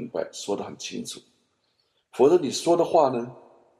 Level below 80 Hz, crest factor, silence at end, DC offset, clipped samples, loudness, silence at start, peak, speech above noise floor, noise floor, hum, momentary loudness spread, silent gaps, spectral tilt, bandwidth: -72 dBFS; 20 dB; 0.4 s; under 0.1%; under 0.1%; -24 LUFS; 0 s; -6 dBFS; 47 dB; -71 dBFS; none; 18 LU; none; -4.5 dB/octave; 13 kHz